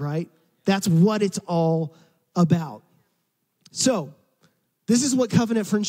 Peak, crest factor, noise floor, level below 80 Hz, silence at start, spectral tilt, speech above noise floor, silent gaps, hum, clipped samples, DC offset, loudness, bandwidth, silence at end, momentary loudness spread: -6 dBFS; 18 dB; -73 dBFS; -68 dBFS; 0 s; -5.5 dB/octave; 52 dB; none; none; under 0.1%; under 0.1%; -22 LUFS; 16 kHz; 0 s; 17 LU